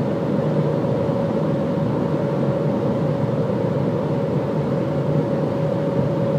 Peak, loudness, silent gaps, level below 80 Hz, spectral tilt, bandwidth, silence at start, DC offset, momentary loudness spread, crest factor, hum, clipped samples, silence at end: -8 dBFS; -21 LUFS; none; -52 dBFS; -9.5 dB/octave; 8.6 kHz; 0 s; under 0.1%; 1 LU; 12 dB; none; under 0.1%; 0 s